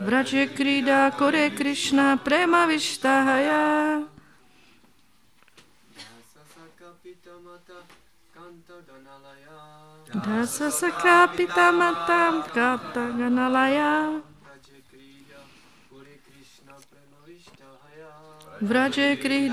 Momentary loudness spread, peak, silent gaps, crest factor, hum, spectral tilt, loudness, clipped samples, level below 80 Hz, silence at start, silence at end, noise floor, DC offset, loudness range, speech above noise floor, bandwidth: 9 LU; -6 dBFS; none; 20 dB; none; -3.5 dB/octave; -22 LUFS; under 0.1%; -66 dBFS; 0 s; 0 s; -63 dBFS; 0.1%; 12 LU; 40 dB; 15.5 kHz